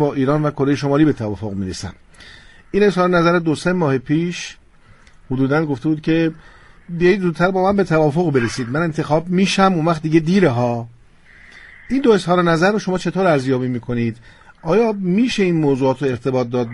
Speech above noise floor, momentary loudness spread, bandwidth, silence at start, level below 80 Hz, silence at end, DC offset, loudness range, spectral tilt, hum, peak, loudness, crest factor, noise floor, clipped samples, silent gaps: 30 dB; 10 LU; 11.5 kHz; 0 s; -44 dBFS; 0 s; under 0.1%; 3 LU; -6.5 dB/octave; none; 0 dBFS; -17 LUFS; 16 dB; -47 dBFS; under 0.1%; none